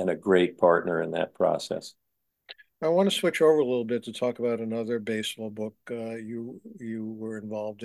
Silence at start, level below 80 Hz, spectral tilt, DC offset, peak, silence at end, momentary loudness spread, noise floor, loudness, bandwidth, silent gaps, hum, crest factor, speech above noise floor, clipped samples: 0 s; -68 dBFS; -5 dB/octave; under 0.1%; -6 dBFS; 0 s; 15 LU; -52 dBFS; -27 LUFS; 12.5 kHz; none; none; 20 dB; 25 dB; under 0.1%